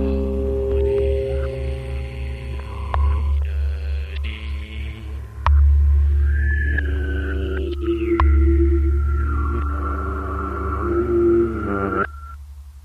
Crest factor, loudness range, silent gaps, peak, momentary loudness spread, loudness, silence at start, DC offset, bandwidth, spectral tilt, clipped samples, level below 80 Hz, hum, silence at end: 16 dB; 5 LU; none; -4 dBFS; 13 LU; -21 LUFS; 0 s; under 0.1%; 4.6 kHz; -9 dB/octave; under 0.1%; -22 dBFS; none; 0.05 s